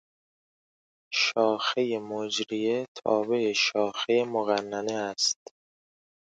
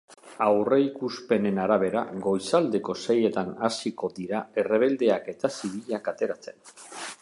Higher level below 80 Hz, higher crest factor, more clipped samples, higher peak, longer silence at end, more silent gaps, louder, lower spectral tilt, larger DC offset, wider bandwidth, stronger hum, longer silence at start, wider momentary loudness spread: second, -78 dBFS vs -68 dBFS; about the same, 20 dB vs 18 dB; neither; about the same, -10 dBFS vs -8 dBFS; first, 1.05 s vs 0.05 s; first, 2.88-2.95 s vs none; about the same, -27 LUFS vs -26 LUFS; second, -2.5 dB/octave vs -5.5 dB/octave; neither; second, 9.4 kHz vs 11.5 kHz; neither; first, 1.1 s vs 0.1 s; second, 7 LU vs 11 LU